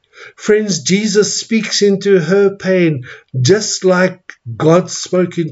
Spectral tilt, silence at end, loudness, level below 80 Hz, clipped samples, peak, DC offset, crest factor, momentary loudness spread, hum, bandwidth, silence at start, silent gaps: -4.5 dB/octave; 0 s; -13 LUFS; -58 dBFS; under 0.1%; 0 dBFS; under 0.1%; 14 dB; 6 LU; none; 8 kHz; 0.2 s; none